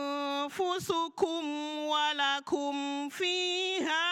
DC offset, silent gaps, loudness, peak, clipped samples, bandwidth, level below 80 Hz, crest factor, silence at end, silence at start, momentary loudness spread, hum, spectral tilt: under 0.1%; none; -31 LUFS; -16 dBFS; under 0.1%; 16.5 kHz; -78 dBFS; 16 dB; 0 s; 0 s; 6 LU; none; -2 dB/octave